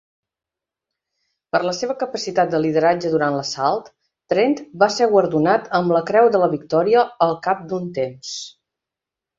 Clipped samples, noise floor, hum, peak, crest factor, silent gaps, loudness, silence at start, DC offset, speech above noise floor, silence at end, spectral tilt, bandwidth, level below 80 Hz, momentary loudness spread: under 0.1%; -87 dBFS; none; -2 dBFS; 18 dB; none; -19 LUFS; 1.55 s; under 0.1%; 69 dB; 0.9 s; -5 dB/octave; 7.8 kHz; -64 dBFS; 10 LU